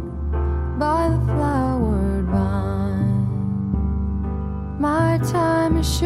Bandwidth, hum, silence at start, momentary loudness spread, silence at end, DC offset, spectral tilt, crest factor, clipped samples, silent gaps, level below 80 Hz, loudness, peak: 14 kHz; none; 0 s; 6 LU; 0 s; under 0.1%; -7 dB/octave; 14 dB; under 0.1%; none; -26 dBFS; -21 LUFS; -6 dBFS